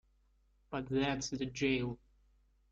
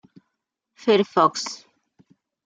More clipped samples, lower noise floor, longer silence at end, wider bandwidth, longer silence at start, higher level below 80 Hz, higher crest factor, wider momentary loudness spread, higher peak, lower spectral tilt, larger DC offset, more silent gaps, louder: neither; second, -71 dBFS vs -80 dBFS; second, 0.75 s vs 0.9 s; second, 7.8 kHz vs 9.2 kHz; second, 0.7 s vs 0.85 s; first, -60 dBFS vs -74 dBFS; about the same, 18 dB vs 22 dB; second, 10 LU vs 14 LU; second, -20 dBFS vs -4 dBFS; about the same, -5 dB/octave vs -4 dB/octave; neither; neither; second, -36 LUFS vs -21 LUFS